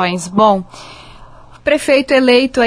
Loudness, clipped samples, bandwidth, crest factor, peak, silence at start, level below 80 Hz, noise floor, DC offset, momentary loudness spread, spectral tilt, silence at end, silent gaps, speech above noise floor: -13 LUFS; under 0.1%; 11 kHz; 14 dB; 0 dBFS; 0 s; -44 dBFS; -38 dBFS; under 0.1%; 15 LU; -4.5 dB/octave; 0 s; none; 25 dB